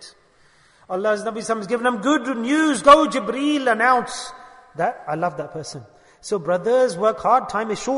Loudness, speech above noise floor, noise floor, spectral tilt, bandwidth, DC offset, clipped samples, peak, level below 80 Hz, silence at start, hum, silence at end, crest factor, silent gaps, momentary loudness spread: -20 LUFS; 36 dB; -55 dBFS; -4 dB/octave; 11 kHz; under 0.1%; under 0.1%; -2 dBFS; -56 dBFS; 0 s; none; 0 s; 20 dB; none; 17 LU